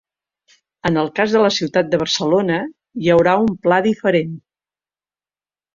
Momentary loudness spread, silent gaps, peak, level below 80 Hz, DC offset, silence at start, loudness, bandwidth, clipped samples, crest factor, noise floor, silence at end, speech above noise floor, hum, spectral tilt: 9 LU; none; -2 dBFS; -54 dBFS; under 0.1%; 0.85 s; -17 LUFS; 7.4 kHz; under 0.1%; 16 dB; under -90 dBFS; 1.35 s; over 74 dB; none; -5 dB/octave